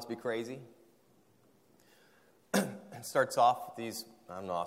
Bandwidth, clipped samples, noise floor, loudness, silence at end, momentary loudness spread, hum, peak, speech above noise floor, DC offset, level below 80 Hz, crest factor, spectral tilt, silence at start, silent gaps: 16 kHz; under 0.1%; -67 dBFS; -34 LUFS; 0 s; 17 LU; none; -14 dBFS; 34 dB; under 0.1%; -80 dBFS; 22 dB; -4 dB/octave; 0 s; none